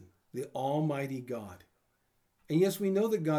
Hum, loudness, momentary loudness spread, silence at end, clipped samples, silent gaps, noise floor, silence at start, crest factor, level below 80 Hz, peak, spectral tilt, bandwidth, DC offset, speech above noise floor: none; -32 LUFS; 13 LU; 0 s; under 0.1%; none; -75 dBFS; 0 s; 16 dB; -78 dBFS; -16 dBFS; -7 dB/octave; over 20 kHz; under 0.1%; 44 dB